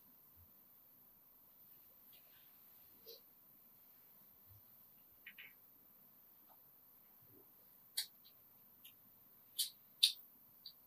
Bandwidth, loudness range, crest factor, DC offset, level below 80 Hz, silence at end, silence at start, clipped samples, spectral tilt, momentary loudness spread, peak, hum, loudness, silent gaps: 15.5 kHz; 19 LU; 38 dB; under 0.1%; -90 dBFS; 0 s; 0 s; under 0.1%; 1.5 dB/octave; 21 LU; -12 dBFS; none; -41 LUFS; none